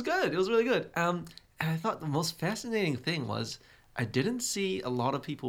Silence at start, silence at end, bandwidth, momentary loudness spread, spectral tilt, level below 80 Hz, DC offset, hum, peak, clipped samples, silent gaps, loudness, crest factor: 0 s; 0 s; 17 kHz; 9 LU; -4.5 dB/octave; -64 dBFS; under 0.1%; none; -12 dBFS; under 0.1%; none; -31 LUFS; 20 dB